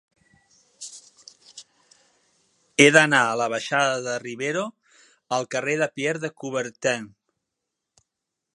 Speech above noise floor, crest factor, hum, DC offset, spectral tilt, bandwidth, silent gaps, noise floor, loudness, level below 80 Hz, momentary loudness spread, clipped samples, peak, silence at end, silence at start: 61 dB; 26 dB; none; under 0.1%; -3.5 dB/octave; 11.5 kHz; none; -83 dBFS; -22 LUFS; -74 dBFS; 24 LU; under 0.1%; 0 dBFS; 1.45 s; 0.8 s